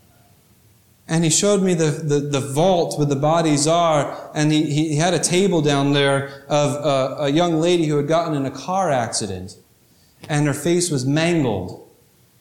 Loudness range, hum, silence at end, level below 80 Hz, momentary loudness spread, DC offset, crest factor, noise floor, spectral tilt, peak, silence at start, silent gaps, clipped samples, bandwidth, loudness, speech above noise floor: 4 LU; none; 0.55 s; -56 dBFS; 7 LU; under 0.1%; 14 dB; -55 dBFS; -5 dB/octave; -6 dBFS; 1.1 s; none; under 0.1%; 16 kHz; -19 LUFS; 37 dB